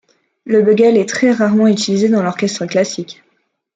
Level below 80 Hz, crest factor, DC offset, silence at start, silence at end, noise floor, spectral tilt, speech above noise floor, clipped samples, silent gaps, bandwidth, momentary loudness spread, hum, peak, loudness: -62 dBFS; 12 dB; under 0.1%; 0.45 s; 0.65 s; -63 dBFS; -5.5 dB/octave; 50 dB; under 0.1%; none; 9.2 kHz; 9 LU; none; -2 dBFS; -14 LUFS